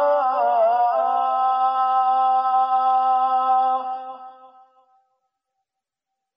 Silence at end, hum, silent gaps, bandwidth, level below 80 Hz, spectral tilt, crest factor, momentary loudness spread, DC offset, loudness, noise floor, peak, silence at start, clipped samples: 1.9 s; none; none; 5.2 kHz; -82 dBFS; -4 dB/octave; 10 dB; 7 LU; under 0.1%; -19 LUFS; -84 dBFS; -10 dBFS; 0 s; under 0.1%